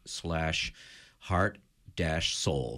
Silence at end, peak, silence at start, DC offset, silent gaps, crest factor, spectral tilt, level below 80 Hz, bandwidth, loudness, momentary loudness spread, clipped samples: 0 s; -14 dBFS; 0.05 s; under 0.1%; none; 20 dB; -4 dB/octave; -46 dBFS; 15 kHz; -31 LUFS; 19 LU; under 0.1%